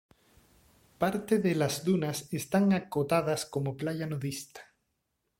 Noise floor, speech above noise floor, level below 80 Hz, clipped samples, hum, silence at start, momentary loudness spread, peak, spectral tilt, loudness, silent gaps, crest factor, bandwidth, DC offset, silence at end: -80 dBFS; 51 dB; -66 dBFS; under 0.1%; none; 1 s; 9 LU; -12 dBFS; -5.5 dB/octave; -30 LUFS; none; 18 dB; 16.5 kHz; under 0.1%; 0.75 s